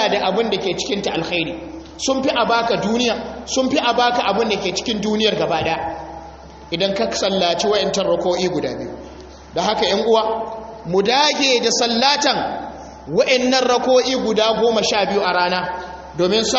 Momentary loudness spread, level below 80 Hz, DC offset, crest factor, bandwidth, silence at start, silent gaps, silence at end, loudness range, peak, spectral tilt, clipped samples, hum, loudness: 14 LU; -46 dBFS; under 0.1%; 18 dB; 8 kHz; 0 s; none; 0 s; 3 LU; -2 dBFS; -2 dB/octave; under 0.1%; none; -18 LUFS